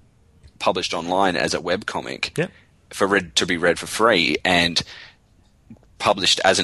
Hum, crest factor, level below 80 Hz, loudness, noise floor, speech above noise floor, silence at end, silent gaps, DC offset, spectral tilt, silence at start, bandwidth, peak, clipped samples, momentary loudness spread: none; 18 dB; -50 dBFS; -20 LUFS; -56 dBFS; 36 dB; 0 s; none; under 0.1%; -3 dB/octave; 0.6 s; 12.5 kHz; -4 dBFS; under 0.1%; 11 LU